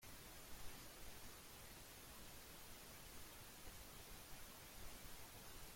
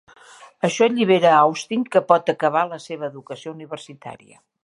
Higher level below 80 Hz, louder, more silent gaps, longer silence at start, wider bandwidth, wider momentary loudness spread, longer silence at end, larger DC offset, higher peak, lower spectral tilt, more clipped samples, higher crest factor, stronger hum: first, -64 dBFS vs -74 dBFS; second, -57 LUFS vs -19 LUFS; neither; second, 0 s vs 0.65 s; first, 16.5 kHz vs 11.5 kHz; second, 1 LU vs 20 LU; second, 0 s vs 0.45 s; neither; second, -40 dBFS vs 0 dBFS; second, -2.5 dB/octave vs -5 dB/octave; neither; about the same, 16 dB vs 20 dB; neither